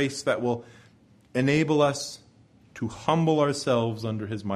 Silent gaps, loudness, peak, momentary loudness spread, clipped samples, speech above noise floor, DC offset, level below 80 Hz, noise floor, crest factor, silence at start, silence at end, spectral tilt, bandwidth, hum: none; -26 LUFS; -8 dBFS; 12 LU; under 0.1%; 32 dB; under 0.1%; -62 dBFS; -57 dBFS; 18 dB; 0 s; 0 s; -5.5 dB/octave; 13.5 kHz; none